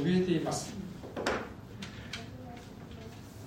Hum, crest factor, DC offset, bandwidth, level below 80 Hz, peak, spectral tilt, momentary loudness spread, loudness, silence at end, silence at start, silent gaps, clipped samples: none; 20 dB; under 0.1%; 16 kHz; -58 dBFS; -14 dBFS; -5.5 dB/octave; 17 LU; -36 LUFS; 0 s; 0 s; none; under 0.1%